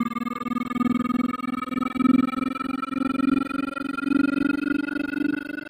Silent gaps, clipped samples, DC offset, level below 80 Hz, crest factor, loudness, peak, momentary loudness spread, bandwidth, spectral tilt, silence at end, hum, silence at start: none; under 0.1%; under 0.1%; -56 dBFS; 16 dB; -25 LUFS; -10 dBFS; 7 LU; 15.5 kHz; -6.5 dB/octave; 0 s; none; 0 s